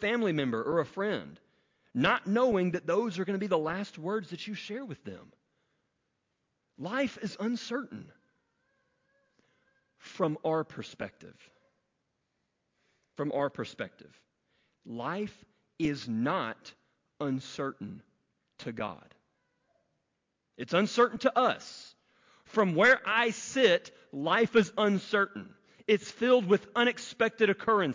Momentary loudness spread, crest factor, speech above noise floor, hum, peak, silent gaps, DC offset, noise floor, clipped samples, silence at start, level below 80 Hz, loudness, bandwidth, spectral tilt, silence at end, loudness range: 18 LU; 20 dB; 52 dB; none; -12 dBFS; none; under 0.1%; -82 dBFS; under 0.1%; 0 s; -70 dBFS; -30 LUFS; 7.6 kHz; -5 dB/octave; 0 s; 13 LU